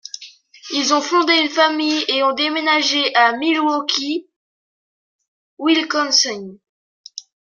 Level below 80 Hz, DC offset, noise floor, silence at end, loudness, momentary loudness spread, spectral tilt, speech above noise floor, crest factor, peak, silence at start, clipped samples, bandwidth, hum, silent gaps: -76 dBFS; under 0.1%; -42 dBFS; 0.35 s; -16 LUFS; 19 LU; -1 dB/octave; 25 dB; 18 dB; -2 dBFS; 0.15 s; under 0.1%; 7.4 kHz; none; 4.36-5.19 s, 5.28-5.57 s, 6.69-7.04 s